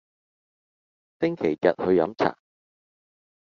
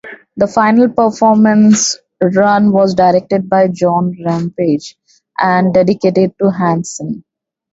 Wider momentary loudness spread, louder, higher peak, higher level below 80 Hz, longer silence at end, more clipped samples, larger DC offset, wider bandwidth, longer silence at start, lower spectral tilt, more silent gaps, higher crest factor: second, 6 LU vs 9 LU; second, -24 LUFS vs -12 LUFS; second, -4 dBFS vs 0 dBFS; second, -68 dBFS vs -52 dBFS; first, 1.25 s vs 0.55 s; neither; neither; second, 6.8 kHz vs 8 kHz; first, 1.2 s vs 0.05 s; about the same, -5.5 dB/octave vs -5.5 dB/octave; neither; first, 22 dB vs 12 dB